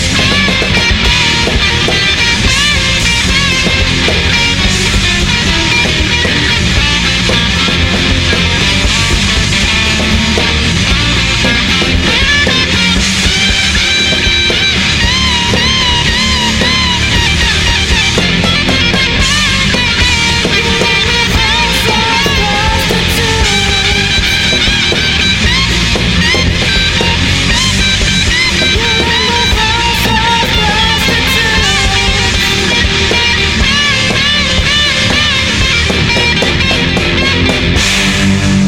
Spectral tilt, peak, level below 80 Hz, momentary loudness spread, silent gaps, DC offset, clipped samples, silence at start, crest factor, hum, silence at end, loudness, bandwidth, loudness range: -3 dB/octave; 0 dBFS; -20 dBFS; 2 LU; none; under 0.1%; under 0.1%; 0 s; 10 dB; none; 0 s; -9 LUFS; 17 kHz; 1 LU